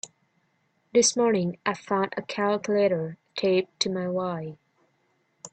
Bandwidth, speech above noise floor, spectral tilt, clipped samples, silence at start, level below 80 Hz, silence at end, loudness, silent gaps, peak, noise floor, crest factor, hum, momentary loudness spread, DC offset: 9.2 kHz; 45 dB; -4 dB/octave; under 0.1%; 0.05 s; -70 dBFS; 0.05 s; -26 LUFS; none; -8 dBFS; -70 dBFS; 18 dB; none; 13 LU; under 0.1%